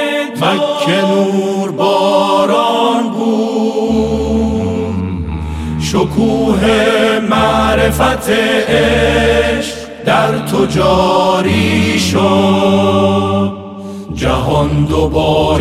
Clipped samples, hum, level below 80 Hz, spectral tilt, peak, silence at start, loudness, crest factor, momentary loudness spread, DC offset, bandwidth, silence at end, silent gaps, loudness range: under 0.1%; none; -28 dBFS; -5.5 dB/octave; 0 dBFS; 0 s; -12 LUFS; 12 dB; 8 LU; under 0.1%; 15.5 kHz; 0 s; none; 3 LU